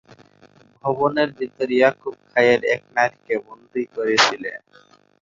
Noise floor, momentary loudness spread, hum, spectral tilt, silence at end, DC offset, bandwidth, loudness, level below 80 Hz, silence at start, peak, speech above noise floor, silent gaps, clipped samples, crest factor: -53 dBFS; 14 LU; 50 Hz at -55 dBFS; -3.5 dB/octave; 0.65 s; under 0.1%; 7.8 kHz; -20 LUFS; -66 dBFS; 0.85 s; 0 dBFS; 32 dB; none; under 0.1%; 20 dB